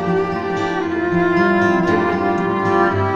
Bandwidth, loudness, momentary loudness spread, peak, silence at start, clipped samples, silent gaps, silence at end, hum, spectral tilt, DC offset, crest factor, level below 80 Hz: 7.6 kHz; -17 LUFS; 5 LU; -2 dBFS; 0 s; under 0.1%; none; 0 s; none; -7.5 dB/octave; under 0.1%; 14 dB; -46 dBFS